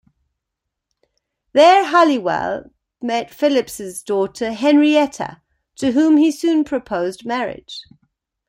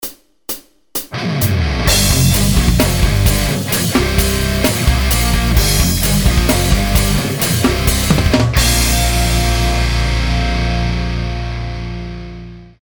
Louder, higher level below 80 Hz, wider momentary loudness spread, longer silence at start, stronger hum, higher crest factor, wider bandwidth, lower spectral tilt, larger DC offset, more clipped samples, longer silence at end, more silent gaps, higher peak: second, -17 LUFS vs -14 LUFS; second, -58 dBFS vs -18 dBFS; first, 17 LU vs 13 LU; first, 1.55 s vs 0 s; neither; about the same, 16 dB vs 14 dB; second, 16 kHz vs over 20 kHz; about the same, -4.5 dB/octave vs -4 dB/octave; second, under 0.1% vs 0.4%; neither; first, 0.65 s vs 0.15 s; neither; about the same, -2 dBFS vs 0 dBFS